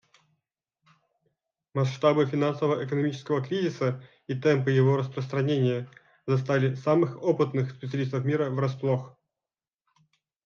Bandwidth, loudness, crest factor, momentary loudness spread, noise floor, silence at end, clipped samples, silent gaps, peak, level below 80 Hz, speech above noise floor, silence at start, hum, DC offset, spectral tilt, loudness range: 7 kHz; -27 LUFS; 18 dB; 8 LU; under -90 dBFS; 1.35 s; under 0.1%; none; -8 dBFS; -74 dBFS; over 64 dB; 1.75 s; none; under 0.1%; -8 dB/octave; 3 LU